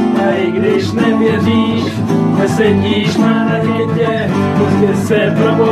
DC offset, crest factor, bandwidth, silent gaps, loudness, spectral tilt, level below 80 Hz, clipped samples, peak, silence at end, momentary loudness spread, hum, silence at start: under 0.1%; 12 dB; 13.5 kHz; none; -13 LUFS; -7 dB/octave; -46 dBFS; under 0.1%; 0 dBFS; 0 s; 3 LU; none; 0 s